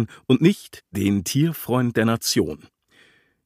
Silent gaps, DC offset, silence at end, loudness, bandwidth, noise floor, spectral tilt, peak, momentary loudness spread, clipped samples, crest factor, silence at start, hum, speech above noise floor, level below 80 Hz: none; under 0.1%; 0.9 s; -21 LUFS; 15.5 kHz; -57 dBFS; -5.5 dB/octave; -4 dBFS; 11 LU; under 0.1%; 20 dB; 0 s; none; 36 dB; -56 dBFS